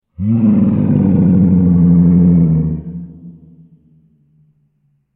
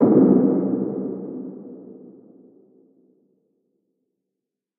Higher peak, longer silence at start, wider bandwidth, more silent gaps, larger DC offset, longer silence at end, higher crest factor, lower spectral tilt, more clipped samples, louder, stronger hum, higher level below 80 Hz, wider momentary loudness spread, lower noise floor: about the same, 0 dBFS vs -2 dBFS; first, 0.2 s vs 0 s; first, 2.7 kHz vs 2.3 kHz; neither; neither; second, 1.85 s vs 2.7 s; second, 12 dB vs 20 dB; first, -16 dB/octave vs -14 dB/octave; neither; first, -11 LUFS vs -20 LUFS; neither; first, -36 dBFS vs -70 dBFS; second, 15 LU vs 26 LU; second, -60 dBFS vs -84 dBFS